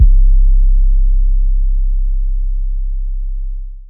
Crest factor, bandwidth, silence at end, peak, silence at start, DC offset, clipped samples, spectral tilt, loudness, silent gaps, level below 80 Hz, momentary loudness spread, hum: 10 dB; 0.2 kHz; 0.05 s; 0 dBFS; 0 s; under 0.1%; under 0.1%; -14 dB/octave; -18 LUFS; none; -10 dBFS; 11 LU; none